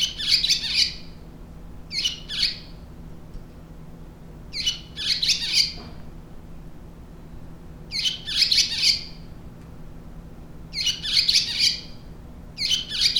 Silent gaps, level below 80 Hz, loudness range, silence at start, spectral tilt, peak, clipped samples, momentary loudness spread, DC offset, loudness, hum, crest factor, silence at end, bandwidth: none; -44 dBFS; 6 LU; 0 s; -0.5 dB/octave; -6 dBFS; under 0.1%; 26 LU; under 0.1%; -21 LUFS; none; 22 dB; 0 s; over 20 kHz